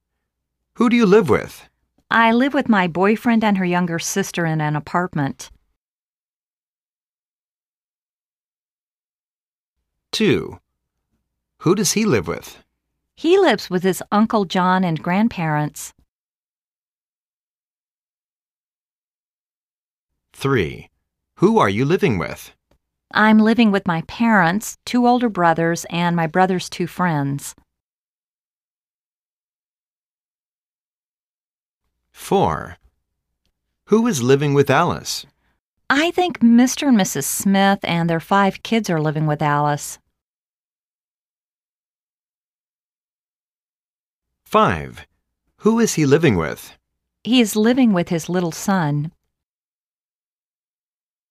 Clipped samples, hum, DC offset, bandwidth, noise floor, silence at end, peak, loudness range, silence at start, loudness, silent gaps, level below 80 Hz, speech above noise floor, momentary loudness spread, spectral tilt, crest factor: under 0.1%; none; under 0.1%; 15.5 kHz; under -90 dBFS; 2.2 s; -2 dBFS; 10 LU; 0.8 s; -18 LUFS; 5.76-9.76 s, 16.09-20.09 s, 27.80-31.80 s, 35.59-35.77 s, 40.21-44.22 s; -54 dBFS; over 73 dB; 12 LU; -5 dB/octave; 18 dB